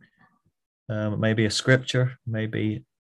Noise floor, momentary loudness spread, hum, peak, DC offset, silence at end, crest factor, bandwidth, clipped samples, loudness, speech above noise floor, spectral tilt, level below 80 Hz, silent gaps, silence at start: -63 dBFS; 9 LU; none; -4 dBFS; under 0.1%; 0.35 s; 22 dB; 12 kHz; under 0.1%; -25 LUFS; 39 dB; -5.5 dB/octave; -56 dBFS; none; 0.9 s